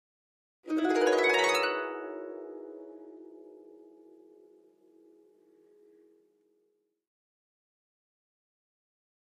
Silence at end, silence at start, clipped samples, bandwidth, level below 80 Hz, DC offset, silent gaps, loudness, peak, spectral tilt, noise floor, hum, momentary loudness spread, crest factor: 5.6 s; 0.65 s; under 0.1%; 14.5 kHz; under -90 dBFS; under 0.1%; none; -28 LUFS; -14 dBFS; -1.5 dB/octave; -76 dBFS; none; 27 LU; 22 dB